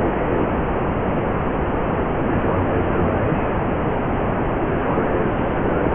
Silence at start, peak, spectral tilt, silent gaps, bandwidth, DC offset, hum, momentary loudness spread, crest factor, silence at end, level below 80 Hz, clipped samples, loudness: 0 s; -6 dBFS; -12 dB/octave; none; 3.7 kHz; 0.3%; none; 2 LU; 14 dB; 0 s; -30 dBFS; under 0.1%; -21 LUFS